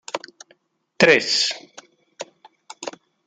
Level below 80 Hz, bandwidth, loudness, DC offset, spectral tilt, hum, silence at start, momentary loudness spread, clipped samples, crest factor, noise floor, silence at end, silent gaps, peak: -70 dBFS; 9.6 kHz; -17 LUFS; under 0.1%; -2.5 dB/octave; none; 0.15 s; 23 LU; under 0.1%; 22 dB; -60 dBFS; 0.35 s; none; -2 dBFS